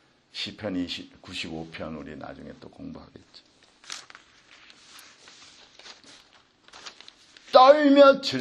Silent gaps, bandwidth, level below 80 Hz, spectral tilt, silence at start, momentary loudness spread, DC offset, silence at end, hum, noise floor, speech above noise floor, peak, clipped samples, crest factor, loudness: none; 10.5 kHz; -64 dBFS; -4.5 dB/octave; 0.35 s; 28 LU; under 0.1%; 0 s; none; -58 dBFS; 35 dB; -2 dBFS; under 0.1%; 24 dB; -20 LUFS